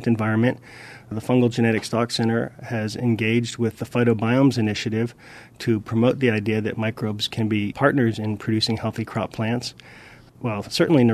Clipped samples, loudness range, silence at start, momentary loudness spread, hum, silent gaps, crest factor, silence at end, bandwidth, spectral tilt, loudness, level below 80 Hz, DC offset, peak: under 0.1%; 2 LU; 0 s; 9 LU; none; none; 20 dB; 0 s; 13.5 kHz; -6 dB/octave; -22 LUFS; -56 dBFS; under 0.1%; -2 dBFS